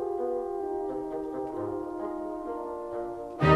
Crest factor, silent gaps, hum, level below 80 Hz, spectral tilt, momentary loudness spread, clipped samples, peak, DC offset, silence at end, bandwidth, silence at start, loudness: 22 dB; none; none; -52 dBFS; -8 dB/octave; 5 LU; under 0.1%; -8 dBFS; under 0.1%; 0 s; 12 kHz; 0 s; -34 LUFS